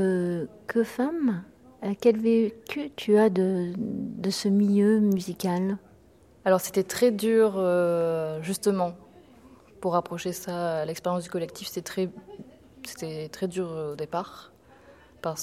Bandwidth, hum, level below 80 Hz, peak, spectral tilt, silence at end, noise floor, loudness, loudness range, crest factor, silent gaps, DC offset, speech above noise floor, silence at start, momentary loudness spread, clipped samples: 16 kHz; none; -64 dBFS; -8 dBFS; -6 dB/octave; 0 s; -56 dBFS; -27 LUFS; 9 LU; 18 dB; none; under 0.1%; 31 dB; 0 s; 14 LU; under 0.1%